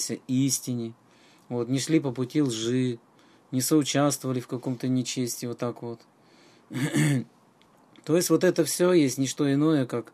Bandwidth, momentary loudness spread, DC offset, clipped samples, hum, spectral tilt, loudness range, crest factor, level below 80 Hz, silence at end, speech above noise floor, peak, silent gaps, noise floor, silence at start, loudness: 15 kHz; 12 LU; under 0.1%; under 0.1%; none; -5 dB/octave; 5 LU; 16 dB; -74 dBFS; 0.1 s; 34 dB; -10 dBFS; none; -59 dBFS; 0 s; -26 LUFS